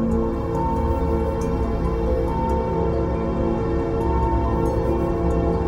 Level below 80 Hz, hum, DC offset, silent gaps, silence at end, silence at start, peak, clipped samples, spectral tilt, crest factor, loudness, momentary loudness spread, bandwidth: -26 dBFS; none; under 0.1%; none; 0 s; 0 s; -8 dBFS; under 0.1%; -9 dB/octave; 12 dB; -22 LUFS; 2 LU; 10.5 kHz